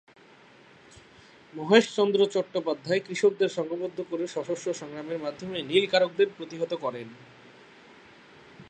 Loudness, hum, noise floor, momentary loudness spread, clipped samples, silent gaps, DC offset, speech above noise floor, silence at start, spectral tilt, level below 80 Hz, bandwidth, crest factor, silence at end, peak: -27 LUFS; none; -54 dBFS; 13 LU; under 0.1%; none; under 0.1%; 28 dB; 1.55 s; -4.5 dB/octave; -74 dBFS; 9 kHz; 24 dB; 0.05 s; -4 dBFS